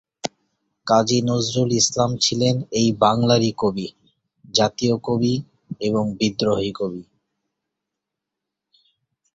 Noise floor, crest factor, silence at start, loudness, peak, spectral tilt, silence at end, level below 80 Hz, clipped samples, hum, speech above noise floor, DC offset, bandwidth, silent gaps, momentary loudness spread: -84 dBFS; 20 dB; 0.25 s; -20 LUFS; -2 dBFS; -4.5 dB/octave; 2.3 s; -54 dBFS; under 0.1%; none; 64 dB; under 0.1%; 8.2 kHz; none; 14 LU